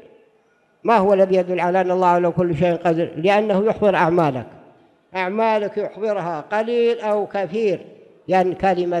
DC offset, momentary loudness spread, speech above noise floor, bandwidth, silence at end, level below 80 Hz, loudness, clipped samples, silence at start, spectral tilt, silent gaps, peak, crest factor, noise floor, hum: under 0.1%; 9 LU; 41 dB; 10.5 kHz; 0 s; -56 dBFS; -19 LUFS; under 0.1%; 0.85 s; -7.5 dB/octave; none; -4 dBFS; 16 dB; -60 dBFS; none